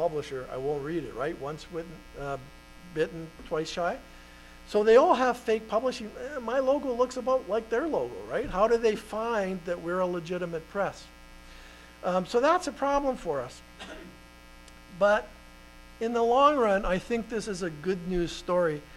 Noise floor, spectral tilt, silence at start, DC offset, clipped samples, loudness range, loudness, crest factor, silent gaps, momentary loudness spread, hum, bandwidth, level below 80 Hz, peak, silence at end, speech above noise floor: -50 dBFS; -5.5 dB/octave; 0 s; under 0.1%; under 0.1%; 8 LU; -28 LUFS; 20 dB; none; 16 LU; 60 Hz at -55 dBFS; 14.5 kHz; -50 dBFS; -8 dBFS; 0 s; 22 dB